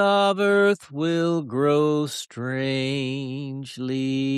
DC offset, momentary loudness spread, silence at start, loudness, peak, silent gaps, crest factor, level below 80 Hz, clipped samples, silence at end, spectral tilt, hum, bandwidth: under 0.1%; 11 LU; 0 s; -23 LUFS; -8 dBFS; none; 16 dB; -68 dBFS; under 0.1%; 0 s; -6 dB/octave; none; 13 kHz